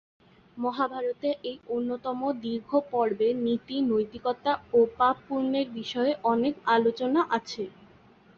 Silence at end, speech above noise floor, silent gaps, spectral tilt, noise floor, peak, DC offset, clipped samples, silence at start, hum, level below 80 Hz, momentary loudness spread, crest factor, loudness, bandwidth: 0.7 s; 29 dB; none; -5.5 dB/octave; -56 dBFS; -10 dBFS; under 0.1%; under 0.1%; 0.55 s; none; -66 dBFS; 8 LU; 18 dB; -28 LUFS; 7 kHz